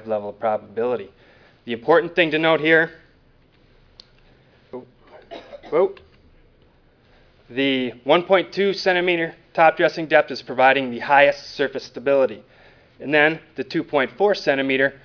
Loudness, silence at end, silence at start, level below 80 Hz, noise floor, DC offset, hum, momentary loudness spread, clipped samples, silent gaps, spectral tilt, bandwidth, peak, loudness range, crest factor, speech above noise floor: -20 LUFS; 0.1 s; 0.05 s; -60 dBFS; -56 dBFS; under 0.1%; none; 15 LU; under 0.1%; none; -5.5 dB/octave; 5.4 kHz; 0 dBFS; 11 LU; 20 dB; 36 dB